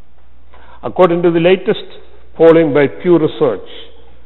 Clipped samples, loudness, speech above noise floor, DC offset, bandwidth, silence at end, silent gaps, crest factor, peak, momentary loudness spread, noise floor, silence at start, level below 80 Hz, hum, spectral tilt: under 0.1%; -12 LUFS; 36 dB; 4%; 4.2 kHz; 0.45 s; none; 14 dB; 0 dBFS; 13 LU; -47 dBFS; 0.85 s; -46 dBFS; none; -9 dB/octave